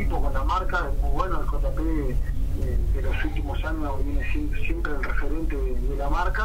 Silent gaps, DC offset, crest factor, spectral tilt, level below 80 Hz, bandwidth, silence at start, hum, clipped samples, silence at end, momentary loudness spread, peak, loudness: none; under 0.1%; 12 dB; -7 dB/octave; -24 dBFS; 15 kHz; 0 s; none; under 0.1%; 0 s; 3 LU; -10 dBFS; -28 LUFS